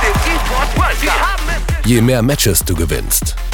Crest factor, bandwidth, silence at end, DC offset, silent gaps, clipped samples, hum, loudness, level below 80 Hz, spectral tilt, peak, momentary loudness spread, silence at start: 14 dB; 19.5 kHz; 0 s; under 0.1%; none; under 0.1%; none; -14 LUFS; -18 dBFS; -4 dB/octave; 0 dBFS; 5 LU; 0 s